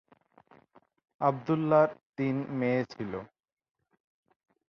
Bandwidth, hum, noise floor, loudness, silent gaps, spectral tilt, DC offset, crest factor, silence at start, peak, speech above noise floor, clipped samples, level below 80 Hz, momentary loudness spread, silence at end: 6.6 kHz; none; -63 dBFS; -29 LUFS; 2.06-2.13 s; -9 dB/octave; under 0.1%; 22 dB; 1.2 s; -10 dBFS; 35 dB; under 0.1%; -70 dBFS; 13 LU; 1.45 s